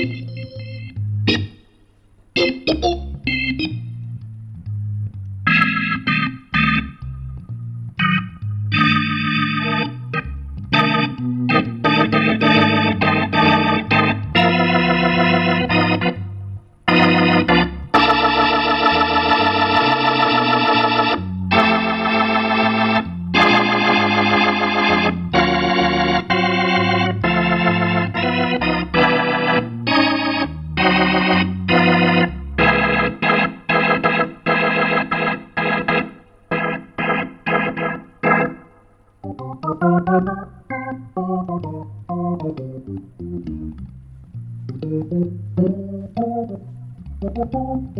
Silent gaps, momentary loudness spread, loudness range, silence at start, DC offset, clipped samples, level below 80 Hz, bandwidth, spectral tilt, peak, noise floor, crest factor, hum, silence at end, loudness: none; 16 LU; 9 LU; 0 s; under 0.1%; under 0.1%; -40 dBFS; 7.6 kHz; -7 dB/octave; -2 dBFS; -52 dBFS; 16 dB; none; 0 s; -17 LUFS